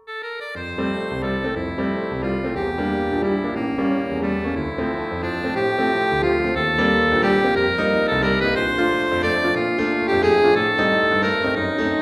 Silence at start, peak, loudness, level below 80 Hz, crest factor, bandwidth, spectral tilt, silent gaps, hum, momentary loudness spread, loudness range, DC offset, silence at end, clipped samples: 0.05 s; -4 dBFS; -21 LUFS; -40 dBFS; 16 dB; 12.5 kHz; -6.5 dB/octave; none; none; 8 LU; 5 LU; under 0.1%; 0 s; under 0.1%